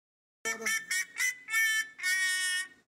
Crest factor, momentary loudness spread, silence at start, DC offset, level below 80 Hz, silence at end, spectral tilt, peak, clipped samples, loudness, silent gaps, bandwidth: 16 dB; 6 LU; 0.45 s; under 0.1%; -84 dBFS; 0.2 s; 2.5 dB/octave; -18 dBFS; under 0.1%; -29 LUFS; none; 16 kHz